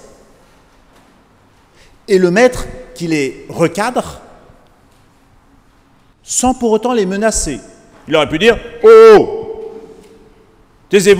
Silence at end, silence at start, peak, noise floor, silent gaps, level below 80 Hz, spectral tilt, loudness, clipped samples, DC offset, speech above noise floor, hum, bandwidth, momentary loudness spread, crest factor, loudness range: 0 s; 2.1 s; 0 dBFS; -49 dBFS; none; -38 dBFS; -4 dB/octave; -11 LUFS; 0.9%; under 0.1%; 39 dB; none; 15.5 kHz; 21 LU; 14 dB; 11 LU